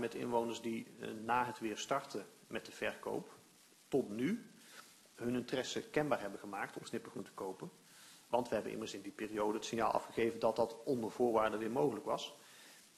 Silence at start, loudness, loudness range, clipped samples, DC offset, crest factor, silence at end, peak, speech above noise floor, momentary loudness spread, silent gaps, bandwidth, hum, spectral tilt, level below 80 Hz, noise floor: 0 s; -39 LUFS; 5 LU; under 0.1%; under 0.1%; 22 dB; 0.15 s; -18 dBFS; 27 dB; 17 LU; none; 13.5 kHz; none; -4.5 dB/octave; -74 dBFS; -65 dBFS